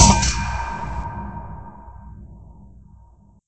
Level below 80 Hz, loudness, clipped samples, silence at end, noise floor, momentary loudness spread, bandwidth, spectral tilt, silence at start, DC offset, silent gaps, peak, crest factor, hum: -28 dBFS; -23 LUFS; under 0.1%; 0.45 s; -50 dBFS; 24 LU; 8.8 kHz; -3.5 dB/octave; 0 s; under 0.1%; none; 0 dBFS; 22 dB; none